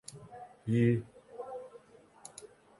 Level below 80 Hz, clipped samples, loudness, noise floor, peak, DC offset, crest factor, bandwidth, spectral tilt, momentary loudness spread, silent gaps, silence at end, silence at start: -66 dBFS; under 0.1%; -33 LUFS; -57 dBFS; -16 dBFS; under 0.1%; 20 dB; 11.5 kHz; -7.5 dB/octave; 23 LU; none; 0.35 s; 0.1 s